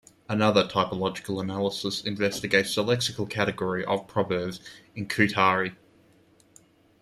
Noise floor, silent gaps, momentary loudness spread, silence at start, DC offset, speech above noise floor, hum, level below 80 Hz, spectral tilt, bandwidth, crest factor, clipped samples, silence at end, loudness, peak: -60 dBFS; none; 10 LU; 0.3 s; under 0.1%; 33 dB; none; -62 dBFS; -4.5 dB/octave; 14.5 kHz; 22 dB; under 0.1%; 1.25 s; -26 LUFS; -4 dBFS